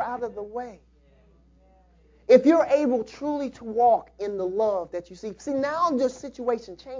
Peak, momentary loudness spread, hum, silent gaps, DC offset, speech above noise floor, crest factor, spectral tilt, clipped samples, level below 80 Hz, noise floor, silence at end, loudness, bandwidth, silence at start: -4 dBFS; 17 LU; none; none; under 0.1%; 33 dB; 22 dB; -6 dB/octave; under 0.1%; -60 dBFS; -57 dBFS; 0 s; -24 LUFS; 7.6 kHz; 0 s